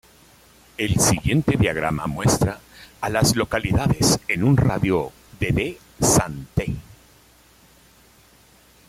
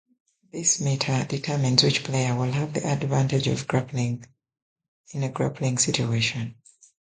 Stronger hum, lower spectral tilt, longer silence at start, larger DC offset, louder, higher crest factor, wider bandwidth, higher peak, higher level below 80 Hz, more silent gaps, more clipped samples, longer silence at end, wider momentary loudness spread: neither; about the same, -4.5 dB/octave vs -4 dB/octave; first, 0.8 s vs 0.55 s; neither; first, -21 LUFS vs -24 LUFS; about the same, 18 dB vs 22 dB; first, 16 kHz vs 9.6 kHz; about the same, -4 dBFS vs -4 dBFS; first, -40 dBFS vs -58 dBFS; second, none vs 4.62-4.76 s, 4.88-5.04 s; neither; first, 2.05 s vs 0.6 s; about the same, 11 LU vs 10 LU